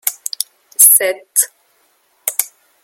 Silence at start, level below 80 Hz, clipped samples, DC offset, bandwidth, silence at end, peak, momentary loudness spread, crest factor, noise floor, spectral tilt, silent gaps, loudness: 0.05 s; -72 dBFS; 0.4%; under 0.1%; over 20 kHz; 0.35 s; 0 dBFS; 16 LU; 18 dB; -58 dBFS; 2.5 dB/octave; none; -13 LUFS